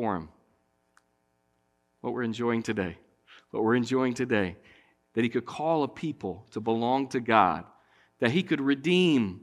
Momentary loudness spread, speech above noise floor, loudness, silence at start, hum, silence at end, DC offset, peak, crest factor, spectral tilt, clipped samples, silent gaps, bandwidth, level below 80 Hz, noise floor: 13 LU; 46 dB; -28 LUFS; 0 s; none; 0 s; under 0.1%; -6 dBFS; 24 dB; -6 dB/octave; under 0.1%; none; 11.5 kHz; -66 dBFS; -73 dBFS